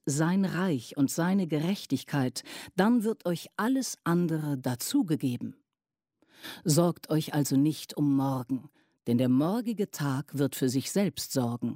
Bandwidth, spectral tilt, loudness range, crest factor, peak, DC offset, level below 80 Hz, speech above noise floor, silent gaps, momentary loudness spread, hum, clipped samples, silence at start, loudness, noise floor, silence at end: 16 kHz; -5.5 dB/octave; 2 LU; 18 dB; -10 dBFS; under 0.1%; -70 dBFS; over 62 dB; none; 7 LU; none; under 0.1%; 0.05 s; -29 LUFS; under -90 dBFS; 0 s